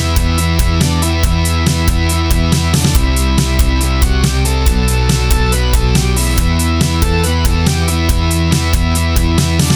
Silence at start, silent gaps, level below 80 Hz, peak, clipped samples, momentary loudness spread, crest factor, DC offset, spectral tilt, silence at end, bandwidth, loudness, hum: 0 s; none; -16 dBFS; 0 dBFS; under 0.1%; 1 LU; 12 dB; under 0.1%; -4.5 dB/octave; 0 s; over 20 kHz; -13 LUFS; none